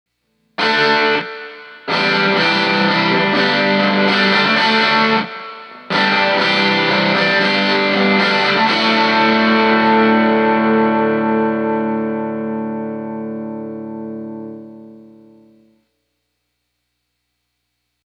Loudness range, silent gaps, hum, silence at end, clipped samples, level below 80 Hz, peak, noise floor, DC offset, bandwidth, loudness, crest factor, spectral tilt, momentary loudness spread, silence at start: 15 LU; none; 60 Hz at -65 dBFS; 3.05 s; under 0.1%; -64 dBFS; 0 dBFS; -72 dBFS; under 0.1%; 9.4 kHz; -14 LUFS; 16 dB; -5 dB/octave; 16 LU; 0.6 s